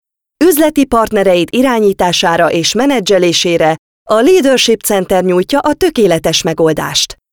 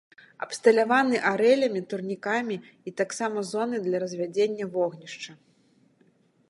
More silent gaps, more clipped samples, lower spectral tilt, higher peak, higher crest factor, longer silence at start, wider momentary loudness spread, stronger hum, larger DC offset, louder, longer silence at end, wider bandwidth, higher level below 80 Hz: first, 3.79-4.06 s vs none; neither; about the same, -4 dB/octave vs -4.5 dB/octave; first, 0 dBFS vs -6 dBFS; second, 10 dB vs 20 dB; about the same, 0.4 s vs 0.4 s; second, 4 LU vs 17 LU; neither; first, 0.3% vs under 0.1%; first, -11 LUFS vs -26 LUFS; second, 0.2 s vs 1.15 s; first, over 20 kHz vs 11.5 kHz; first, -40 dBFS vs -80 dBFS